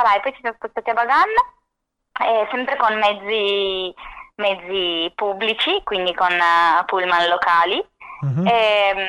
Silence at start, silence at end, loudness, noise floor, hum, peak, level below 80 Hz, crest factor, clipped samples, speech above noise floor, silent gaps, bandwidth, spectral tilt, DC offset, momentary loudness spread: 0 s; 0 s; -18 LUFS; -76 dBFS; none; -6 dBFS; -54 dBFS; 12 dB; under 0.1%; 58 dB; none; 11.5 kHz; -5.5 dB/octave; under 0.1%; 11 LU